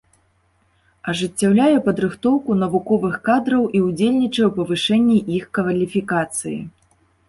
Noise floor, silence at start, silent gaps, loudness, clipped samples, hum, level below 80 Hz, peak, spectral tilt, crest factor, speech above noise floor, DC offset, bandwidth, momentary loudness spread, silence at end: -62 dBFS; 1.05 s; none; -19 LUFS; under 0.1%; none; -56 dBFS; -4 dBFS; -5.5 dB/octave; 14 dB; 44 dB; under 0.1%; 11.5 kHz; 9 LU; 0.6 s